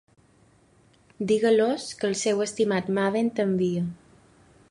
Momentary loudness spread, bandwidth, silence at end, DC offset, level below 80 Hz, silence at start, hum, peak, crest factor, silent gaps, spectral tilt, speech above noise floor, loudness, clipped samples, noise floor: 7 LU; 11 kHz; 0.75 s; under 0.1%; -66 dBFS; 1.2 s; none; -10 dBFS; 16 dB; none; -5 dB/octave; 36 dB; -25 LUFS; under 0.1%; -60 dBFS